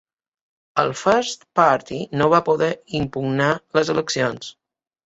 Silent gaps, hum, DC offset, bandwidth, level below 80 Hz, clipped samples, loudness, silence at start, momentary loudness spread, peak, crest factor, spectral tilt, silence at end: none; none; under 0.1%; 8 kHz; -54 dBFS; under 0.1%; -20 LUFS; 0.75 s; 8 LU; -2 dBFS; 20 dB; -5 dB/octave; 0.55 s